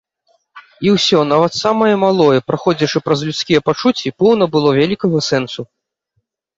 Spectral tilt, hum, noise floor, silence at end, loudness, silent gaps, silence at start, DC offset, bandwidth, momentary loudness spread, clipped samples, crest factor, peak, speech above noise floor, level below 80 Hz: -5.5 dB/octave; none; -69 dBFS; 0.95 s; -14 LUFS; none; 0.55 s; under 0.1%; 8 kHz; 6 LU; under 0.1%; 14 dB; 0 dBFS; 55 dB; -54 dBFS